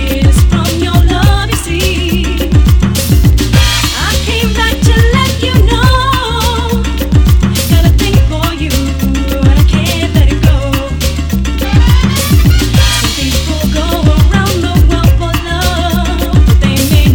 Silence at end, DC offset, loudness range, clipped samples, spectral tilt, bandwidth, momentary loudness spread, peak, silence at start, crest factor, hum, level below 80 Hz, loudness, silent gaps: 0 s; under 0.1%; 1 LU; 0.7%; -5 dB/octave; over 20 kHz; 5 LU; 0 dBFS; 0 s; 8 dB; none; -12 dBFS; -10 LUFS; none